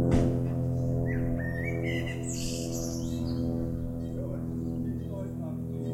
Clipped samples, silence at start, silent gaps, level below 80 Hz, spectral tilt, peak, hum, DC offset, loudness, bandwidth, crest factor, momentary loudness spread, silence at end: under 0.1%; 0 s; none; -42 dBFS; -6.5 dB/octave; -12 dBFS; none; under 0.1%; -32 LUFS; 15 kHz; 18 dB; 6 LU; 0 s